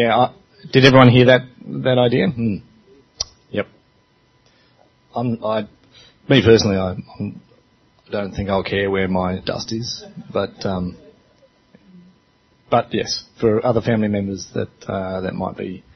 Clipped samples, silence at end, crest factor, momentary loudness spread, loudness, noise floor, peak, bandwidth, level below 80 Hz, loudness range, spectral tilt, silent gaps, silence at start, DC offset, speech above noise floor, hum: under 0.1%; 0.15 s; 20 dB; 16 LU; -18 LUFS; -58 dBFS; 0 dBFS; 6.4 kHz; -48 dBFS; 12 LU; -6 dB/octave; none; 0 s; under 0.1%; 40 dB; none